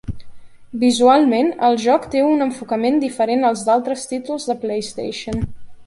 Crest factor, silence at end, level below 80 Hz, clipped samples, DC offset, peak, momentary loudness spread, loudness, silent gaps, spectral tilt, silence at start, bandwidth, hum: 16 dB; 0 s; -42 dBFS; under 0.1%; under 0.1%; -2 dBFS; 13 LU; -18 LUFS; none; -5 dB/octave; 0.05 s; 11.5 kHz; none